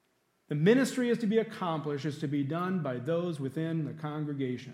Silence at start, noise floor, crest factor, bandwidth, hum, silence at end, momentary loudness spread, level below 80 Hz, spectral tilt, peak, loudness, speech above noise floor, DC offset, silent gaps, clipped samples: 0.5 s; -72 dBFS; 18 dB; 15.5 kHz; none; 0 s; 10 LU; -82 dBFS; -7 dB/octave; -12 dBFS; -31 LUFS; 42 dB; under 0.1%; none; under 0.1%